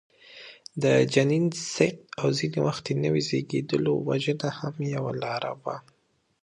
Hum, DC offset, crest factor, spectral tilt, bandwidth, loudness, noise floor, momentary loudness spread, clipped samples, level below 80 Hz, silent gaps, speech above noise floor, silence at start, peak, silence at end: none; under 0.1%; 22 dB; -5.5 dB/octave; 11 kHz; -26 LUFS; -48 dBFS; 13 LU; under 0.1%; -64 dBFS; none; 22 dB; 0.3 s; -6 dBFS; 0.65 s